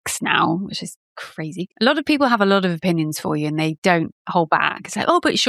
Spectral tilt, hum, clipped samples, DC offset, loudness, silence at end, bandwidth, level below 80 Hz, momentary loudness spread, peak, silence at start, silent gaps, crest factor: -4.5 dB/octave; none; under 0.1%; under 0.1%; -19 LUFS; 0 s; 14 kHz; -62 dBFS; 13 LU; -2 dBFS; 0.05 s; 0.96-1.16 s, 3.78-3.82 s, 4.12-4.25 s; 18 dB